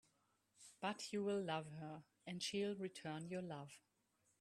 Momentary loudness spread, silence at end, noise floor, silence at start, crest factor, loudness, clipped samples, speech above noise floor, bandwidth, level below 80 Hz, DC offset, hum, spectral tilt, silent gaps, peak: 16 LU; 0.65 s; -82 dBFS; 0.6 s; 20 dB; -47 LUFS; under 0.1%; 36 dB; 13 kHz; -86 dBFS; under 0.1%; none; -4.5 dB/octave; none; -28 dBFS